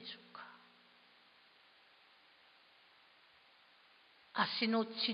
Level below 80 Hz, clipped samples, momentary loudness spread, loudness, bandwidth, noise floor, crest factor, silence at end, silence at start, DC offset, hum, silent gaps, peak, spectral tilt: under -90 dBFS; under 0.1%; 25 LU; -37 LUFS; 5.2 kHz; -67 dBFS; 26 dB; 0 s; 0 s; under 0.1%; none; none; -18 dBFS; -1.5 dB/octave